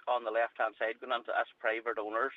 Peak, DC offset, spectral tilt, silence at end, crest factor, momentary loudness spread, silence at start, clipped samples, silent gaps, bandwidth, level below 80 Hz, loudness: -16 dBFS; under 0.1%; -4 dB/octave; 0 s; 18 dB; 3 LU; 0.05 s; under 0.1%; none; 5.2 kHz; -88 dBFS; -34 LUFS